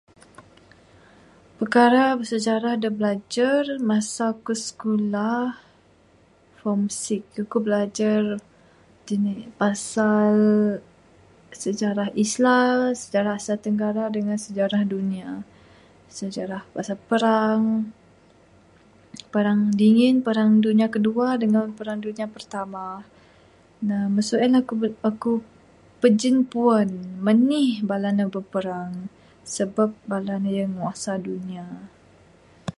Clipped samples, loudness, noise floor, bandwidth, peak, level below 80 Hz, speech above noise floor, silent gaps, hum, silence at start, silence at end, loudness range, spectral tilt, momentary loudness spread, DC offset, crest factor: under 0.1%; -22 LUFS; -56 dBFS; 11.5 kHz; -4 dBFS; -64 dBFS; 35 dB; none; none; 0.4 s; 0.05 s; 6 LU; -5.5 dB/octave; 14 LU; under 0.1%; 18 dB